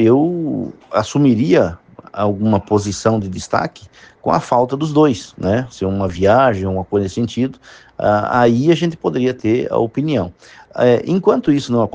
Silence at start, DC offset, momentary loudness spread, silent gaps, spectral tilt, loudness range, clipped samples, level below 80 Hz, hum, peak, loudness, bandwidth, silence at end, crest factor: 0 s; under 0.1%; 8 LU; none; -7 dB/octave; 2 LU; under 0.1%; -50 dBFS; none; 0 dBFS; -16 LUFS; 9.6 kHz; 0.05 s; 16 dB